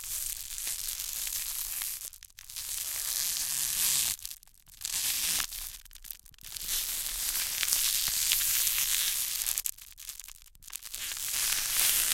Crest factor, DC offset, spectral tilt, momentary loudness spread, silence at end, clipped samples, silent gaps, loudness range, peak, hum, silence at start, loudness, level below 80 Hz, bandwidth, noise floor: 32 dB; under 0.1%; 2.5 dB/octave; 17 LU; 0 s; under 0.1%; none; 5 LU; -2 dBFS; none; 0 s; -29 LUFS; -54 dBFS; 17 kHz; -52 dBFS